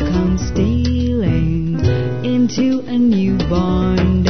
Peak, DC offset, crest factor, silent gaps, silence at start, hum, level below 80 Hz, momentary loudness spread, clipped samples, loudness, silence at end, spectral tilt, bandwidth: -2 dBFS; 3%; 14 dB; none; 0 s; none; -26 dBFS; 2 LU; under 0.1%; -16 LUFS; 0 s; -7.5 dB/octave; 6.4 kHz